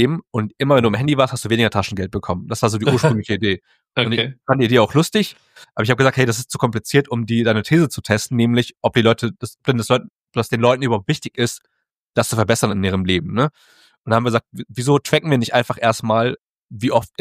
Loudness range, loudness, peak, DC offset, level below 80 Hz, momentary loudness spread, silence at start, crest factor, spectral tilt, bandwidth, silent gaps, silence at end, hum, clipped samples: 2 LU; -18 LUFS; 0 dBFS; under 0.1%; -52 dBFS; 9 LU; 0 s; 18 dB; -5.5 dB/octave; 15.5 kHz; 10.10-10.14 s, 10.21-10.25 s, 11.97-12.07 s, 13.98-14.04 s, 16.41-16.69 s; 0.15 s; none; under 0.1%